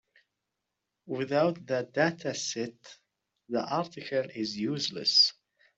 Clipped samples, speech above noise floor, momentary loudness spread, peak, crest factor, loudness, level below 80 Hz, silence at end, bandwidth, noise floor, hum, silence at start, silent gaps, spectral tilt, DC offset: under 0.1%; 56 dB; 13 LU; -12 dBFS; 20 dB; -29 LUFS; -76 dBFS; 0.45 s; 8.2 kHz; -85 dBFS; none; 1.05 s; none; -3.5 dB/octave; under 0.1%